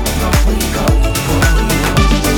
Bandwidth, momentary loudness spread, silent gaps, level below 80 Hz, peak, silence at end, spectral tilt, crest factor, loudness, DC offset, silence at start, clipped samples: over 20 kHz; 2 LU; none; -14 dBFS; 0 dBFS; 0 s; -4.5 dB/octave; 12 dB; -13 LUFS; under 0.1%; 0 s; under 0.1%